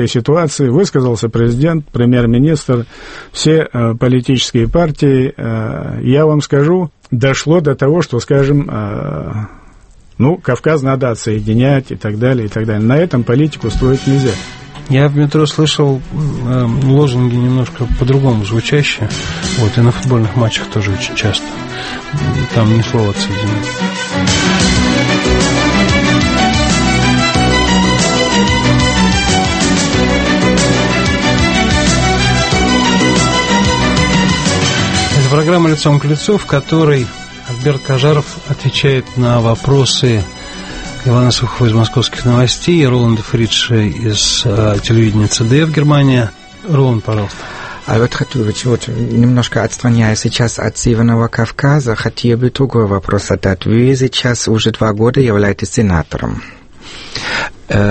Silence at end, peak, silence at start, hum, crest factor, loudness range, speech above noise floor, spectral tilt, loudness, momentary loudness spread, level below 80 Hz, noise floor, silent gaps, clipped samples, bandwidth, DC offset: 0 s; 0 dBFS; 0 s; none; 12 dB; 4 LU; 28 dB; -5 dB/octave; -12 LUFS; 8 LU; -28 dBFS; -40 dBFS; none; under 0.1%; 8.8 kHz; under 0.1%